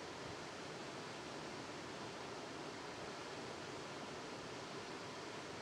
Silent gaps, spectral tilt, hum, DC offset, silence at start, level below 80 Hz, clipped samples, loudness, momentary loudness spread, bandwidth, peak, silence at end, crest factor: none; -3.5 dB/octave; none; under 0.1%; 0 s; -76 dBFS; under 0.1%; -48 LUFS; 0 LU; 16 kHz; -36 dBFS; 0 s; 14 dB